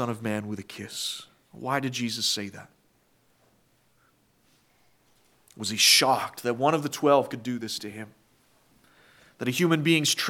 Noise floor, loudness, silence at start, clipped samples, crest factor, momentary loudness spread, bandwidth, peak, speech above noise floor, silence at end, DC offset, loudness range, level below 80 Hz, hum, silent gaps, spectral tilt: -66 dBFS; -25 LUFS; 0 s; under 0.1%; 22 dB; 18 LU; 18 kHz; -6 dBFS; 40 dB; 0 s; under 0.1%; 10 LU; -76 dBFS; none; none; -3 dB/octave